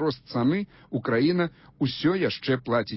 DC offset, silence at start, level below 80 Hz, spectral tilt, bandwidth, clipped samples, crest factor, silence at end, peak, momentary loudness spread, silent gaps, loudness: under 0.1%; 0 s; -60 dBFS; -10.5 dB/octave; 5.8 kHz; under 0.1%; 14 dB; 0 s; -12 dBFS; 7 LU; none; -26 LUFS